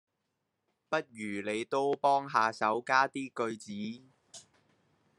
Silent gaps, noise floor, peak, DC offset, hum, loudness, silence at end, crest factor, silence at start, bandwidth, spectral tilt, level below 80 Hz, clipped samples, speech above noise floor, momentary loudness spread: none; -83 dBFS; -12 dBFS; under 0.1%; none; -31 LUFS; 0.8 s; 22 dB; 0.9 s; 11.5 kHz; -4.5 dB/octave; -82 dBFS; under 0.1%; 51 dB; 18 LU